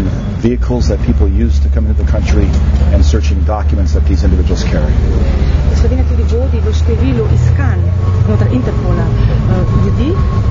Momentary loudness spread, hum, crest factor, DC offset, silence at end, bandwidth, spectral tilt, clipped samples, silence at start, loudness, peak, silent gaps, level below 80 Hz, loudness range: 2 LU; none; 10 dB; under 0.1%; 0 s; 7.4 kHz; -8 dB/octave; under 0.1%; 0 s; -12 LUFS; 0 dBFS; none; -12 dBFS; 0 LU